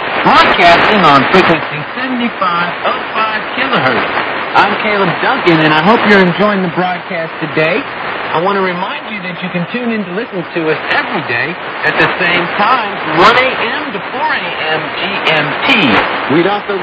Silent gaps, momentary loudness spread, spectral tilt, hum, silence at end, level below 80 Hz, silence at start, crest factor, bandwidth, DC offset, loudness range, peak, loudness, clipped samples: none; 11 LU; -6 dB/octave; none; 0 s; -46 dBFS; 0 s; 12 dB; 8 kHz; under 0.1%; 5 LU; 0 dBFS; -11 LUFS; 0.5%